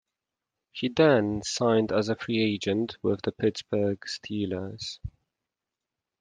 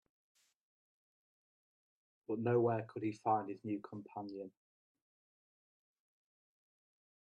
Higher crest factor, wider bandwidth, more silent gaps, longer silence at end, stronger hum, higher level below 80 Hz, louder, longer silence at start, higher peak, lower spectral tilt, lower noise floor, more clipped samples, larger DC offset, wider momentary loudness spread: about the same, 20 dB vs 22 dB; first, 10 kHz vs 9 kHz; neither; second, 1.1 s vs 2.8 s; neither; first, -58 dBFS vs -86 dBFS; first, -27 LUFS vs -39 LUFS; second, 0.75 s vs 2.3 s; first, -8 dBFS vs -22 dBFS; second, -5.5 dB/octave vs -9 dB/octave; about the same, -88 dBFS vs under -90 dBFS; neither; neither; about the same, 14 LU vs 16 LU